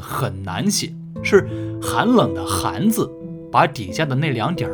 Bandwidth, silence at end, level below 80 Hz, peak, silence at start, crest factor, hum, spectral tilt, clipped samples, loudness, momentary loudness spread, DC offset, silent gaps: over 20 kHz; 0 s; -48 dBFS; 0 dBFS; 0 s; 20 dB; none; -5 dB/octave; under 0.1%; -20 LUFS; 9 LU; under 0.1%; none